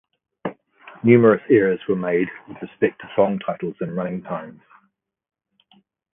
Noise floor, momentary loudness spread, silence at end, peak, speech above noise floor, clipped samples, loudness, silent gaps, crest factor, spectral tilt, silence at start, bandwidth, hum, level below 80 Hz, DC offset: -68 dBFS; 19 LU; 1.65 s; 0 dBFS; 48 dB; under 0.1%; -20 LUFS; none; 22 dB; -12 dB/octave; 0.45 s; 3.7 kHz; none; -64 dBFS; under 0.1%